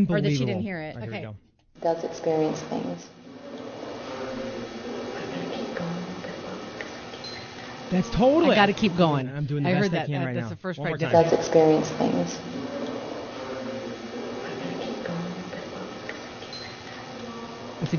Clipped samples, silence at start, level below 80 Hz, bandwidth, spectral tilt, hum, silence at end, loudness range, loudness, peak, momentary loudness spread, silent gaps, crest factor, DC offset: under 0.1%; 0 s; -54 dBFS; 7 kHz; -6 dB/octave; none; 0 s; 11 LU; -27 LUFS; -4 dBFS; 17 LU; none; 24 dB; under 0.1%